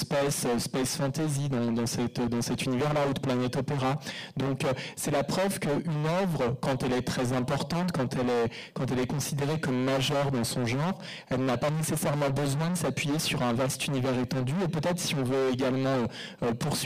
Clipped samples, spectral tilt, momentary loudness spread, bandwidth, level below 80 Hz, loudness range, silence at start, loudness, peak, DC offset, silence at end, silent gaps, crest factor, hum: under 0.1%; -5 dB/octave; 3 LU; 15.5 kHz; -56 dBFS; 1 LU; 0 s; -29 LUFS; -20 dBFS; under 0.1%; 0 s; none; 8 dB; none